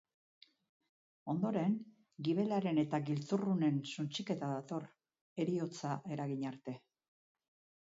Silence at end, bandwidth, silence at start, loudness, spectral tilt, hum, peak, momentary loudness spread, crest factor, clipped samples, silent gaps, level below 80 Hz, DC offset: 1.05 s; 7.6 kHz; 1.25 s; -38 LUFS; -6.5 dB/octave; none; -22 dBFS; 14 LU; 16 dB; under 0.1%; 5.21-5.36 s; -82 dBFS; under 0.1%